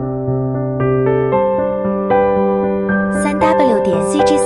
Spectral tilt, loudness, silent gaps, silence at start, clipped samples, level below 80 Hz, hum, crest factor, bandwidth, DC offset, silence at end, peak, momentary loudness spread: -6.5 dB/octave; -15 LUFS; none; 0 s; under 0.1%; -40 dBFS; none; 12 dB; 11.5 kHz; under 0.1%; 0 s; -2 dBFS; 5 LU